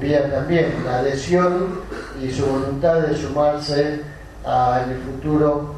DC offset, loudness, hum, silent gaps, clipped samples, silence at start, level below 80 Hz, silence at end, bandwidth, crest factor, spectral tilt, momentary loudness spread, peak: under 0.1%; -20 LUFS; none; none; under 0.1%; 0 s; -40 dBFS; 0 s; 13 kHz; 14 dB; -6.5 dB/octave; 10 LU; -6 dBFS